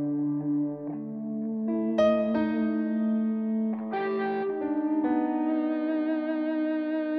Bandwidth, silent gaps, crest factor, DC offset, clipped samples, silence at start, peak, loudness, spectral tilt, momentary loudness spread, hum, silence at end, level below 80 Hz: 6.2 kHz; none; 14 dB; under 0.1%; under 0.1%; 0 s; -12 dBFS; -28 LUFS; -8.5 dB/octave; 6 LU; none; 0 s; -66 dBFS